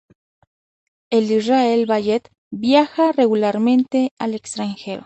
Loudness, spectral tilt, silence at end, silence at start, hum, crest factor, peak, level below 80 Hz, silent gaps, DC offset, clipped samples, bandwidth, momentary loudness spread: -18 LUFS; -5.5 dB/octave; 0.05 s; 1.1 s; none; 16 dB; -2 dBFS; -64 dBFS; 2.38-2.51 s, 4.11-4.17 s; under 0.1%; under 0.1%; 8.6 kHz; 10 LU